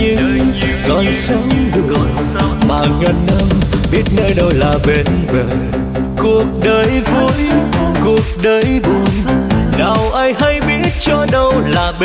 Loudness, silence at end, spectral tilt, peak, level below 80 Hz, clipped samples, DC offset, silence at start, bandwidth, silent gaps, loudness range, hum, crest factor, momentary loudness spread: -13 LUFS; 0 s; -12.5 dB/octave; -2 dBFS; -22 dBFS; under 0.1%; under 0.1%; 0 s; 5 kHz; none; 1 LU; none; 10 dB; 3 LU